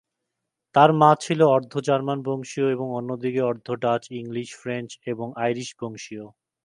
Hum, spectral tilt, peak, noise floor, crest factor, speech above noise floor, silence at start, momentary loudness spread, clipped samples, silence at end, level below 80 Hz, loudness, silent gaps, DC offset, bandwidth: none; -6 dB/octave; 0 dBFS; -82 dBFS; 22 dB; 59 dB; 0.75 s; 15 LU; under 0.1%; 0.4 s; -70 dBFS; -23 LUFS; none; under 0.1%; 11.5 kHz